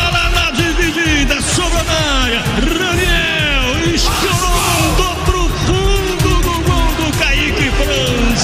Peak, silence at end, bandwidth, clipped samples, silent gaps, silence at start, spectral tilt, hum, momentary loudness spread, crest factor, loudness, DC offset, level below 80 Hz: 0 dBFS; 0 s; 16 kHz; under 0.1%; none; 0 s; -3.5 dB/octave; none; 2 LU; 12 dB; -14 LUFS; under 0.1%; -18 dBFS